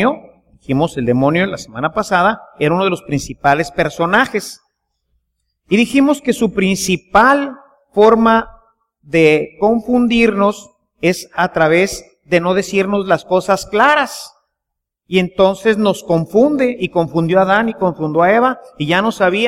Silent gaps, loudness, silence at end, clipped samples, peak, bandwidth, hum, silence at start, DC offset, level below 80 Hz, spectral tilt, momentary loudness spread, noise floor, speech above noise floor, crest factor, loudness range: none; -14 LUFS; 0 s; under 0.1%; 0 dBFS; 16 kHz; none; 0 s; under 0.1%; -44 dBFS; -5.5 dB/octave; 8 LU; -78 dBFS; 65 dB; 14 dB; 3 LU